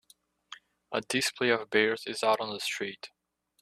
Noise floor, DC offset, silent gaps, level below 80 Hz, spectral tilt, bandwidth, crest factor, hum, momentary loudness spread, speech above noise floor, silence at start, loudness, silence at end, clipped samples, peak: -65 dBFS; under 0.1%; none; -72 dBFS; -2.5 dB/octave; 14 kHz; 22 dB; none; 23 LU; 35 dB; 0.5 s; -29 LUFS; 0.55 s; under 0.1%; -10 dBFS